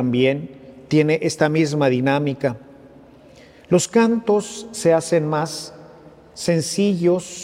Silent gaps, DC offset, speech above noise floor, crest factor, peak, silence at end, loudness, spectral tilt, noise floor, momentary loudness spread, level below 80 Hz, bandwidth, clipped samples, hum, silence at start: none; under 0.1%; 28 dB; 18 dB; -2 dBFS; 0 s; -19 LUFS; -5.5 dB/octave; -46 dBFS; 10 LU; -60 dBFS; 16 kHz; under 0.1%; none; 0 s